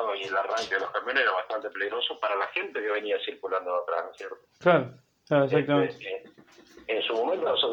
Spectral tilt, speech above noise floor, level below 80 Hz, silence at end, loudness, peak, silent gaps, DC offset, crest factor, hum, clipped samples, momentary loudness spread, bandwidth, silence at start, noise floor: -5 dB/octave; 26 dB; -74 dBFS; 0 s; -27 LUFS; -8 dBFS; none; under 0.1%; 20 dB; none; under 0.1%; 14 LU; 8.8 kHz; 0 s; -53 dBFS